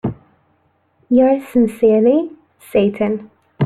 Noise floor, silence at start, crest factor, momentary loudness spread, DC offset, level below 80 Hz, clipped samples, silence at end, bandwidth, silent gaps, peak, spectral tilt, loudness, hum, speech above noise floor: -60 dBFS; 0.05 s; 14 dB; 12 LU; under 0.1%; -52 dBFS; under 0.1%; 0 s; 13.5 kHz; none; -2 dBFS; -8.5 dB/octave; -16 LUFS; none; 46 dB